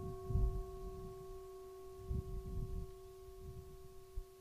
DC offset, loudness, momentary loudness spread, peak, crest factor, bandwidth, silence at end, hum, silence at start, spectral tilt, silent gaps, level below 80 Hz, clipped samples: under 0.1%; -47 LUFS; 15 LU; -24 dBFS; 20 dB; 15.5 kHz; 0 s; none; 0 s; -8 dB/octave; none; -46 dBFS; under 0.1%